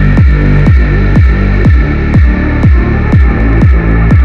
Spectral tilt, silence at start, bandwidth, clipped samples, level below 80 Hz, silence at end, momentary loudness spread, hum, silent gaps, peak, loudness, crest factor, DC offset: -9.5 dB/octave; 0 s; 5.6 kHz; 5%; -8 dBFS; 0 s; 2 LU; none; none; 0 dBFS; -8 LUFS; 6 dB; under 0.1%